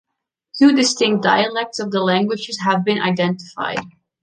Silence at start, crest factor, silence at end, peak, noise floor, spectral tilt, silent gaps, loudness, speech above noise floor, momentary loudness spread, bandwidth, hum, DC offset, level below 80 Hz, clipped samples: 0.55 s; 16 dB; 0.35 s; -2 dBFS; -69 dBFS; -4.5 dB/octave; none; -18 LUFS; 51 dB; 10 LU; 9.6 kHz; none; under 0.1%; -62 dBFS; under 0.1%